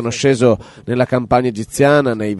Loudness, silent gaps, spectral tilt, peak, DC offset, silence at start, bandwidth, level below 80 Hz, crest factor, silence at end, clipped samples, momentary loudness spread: -15 LUFS; none; -6 dB/octave; -2 dBFS; under 0.1%; 0 s; 11.5 kHz; -46 dBFS; 14 dB; 0 s; under 0.1%; 8 LU